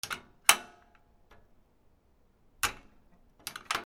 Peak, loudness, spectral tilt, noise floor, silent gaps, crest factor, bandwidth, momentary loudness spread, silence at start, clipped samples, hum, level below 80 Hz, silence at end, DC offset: 0 dBFS; -29 LUFS; 1 dB/octave; -66 dBFS; none; 36 dB; over 20 kHz; 19 LU; 0.05 s; under 0.1%; none; -62 dBFS; 0 s; under 0.1%